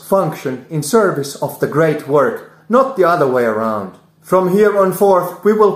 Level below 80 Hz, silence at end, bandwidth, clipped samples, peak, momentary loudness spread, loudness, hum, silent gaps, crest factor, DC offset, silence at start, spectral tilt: -58 dBFS; 0 s; 16 kHz; under 0.1%; 0 dBFS; 10 LU; -15 LUFS; none; none; 14 dB; under 0.1%; 0.05 s; -6 dB/octave